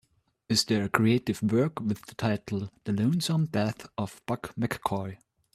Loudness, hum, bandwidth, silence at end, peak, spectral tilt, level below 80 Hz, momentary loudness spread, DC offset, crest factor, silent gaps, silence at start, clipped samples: -29 LUFS; none; 15 kHz; 0.4 s; -4 dBFS; -5.5 dB/octave; -62 dBFS; 10 LU; under 0.1%; 26 dB; none; 0.5 s; under 0.1%